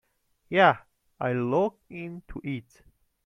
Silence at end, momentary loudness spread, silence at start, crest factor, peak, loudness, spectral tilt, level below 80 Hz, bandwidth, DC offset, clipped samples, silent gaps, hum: 0.65 s; 18 LU; 0.5 s; 22 dB; -6 dBFS; -26 LUFS; -7.5 dB/octave; -56 dBFS; 11 kHz; under 0.1%; under 0.1%; none; none